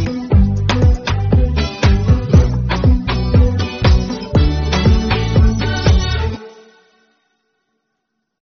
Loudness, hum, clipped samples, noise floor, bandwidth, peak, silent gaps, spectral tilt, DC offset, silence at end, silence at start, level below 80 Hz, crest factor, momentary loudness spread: -15 LUFS; none; under 0.1%; -72 dBFS; 7 kHz; 0 dBFS; none; -6 dB/octave; under 0.1%; 2.1 s; 0 s; -18 dBFS; 14 dB; 4 LU